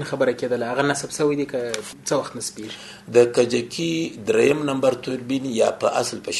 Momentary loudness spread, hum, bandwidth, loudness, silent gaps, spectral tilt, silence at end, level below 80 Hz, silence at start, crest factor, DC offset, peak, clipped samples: 11 LU; none; 12.5 kHz; -22 LUFS; none; -4 dB/octave; 0 s; -62 dBFS; 0 s; 18 dB; under 0.1%; -4 dBFS; under 0.1%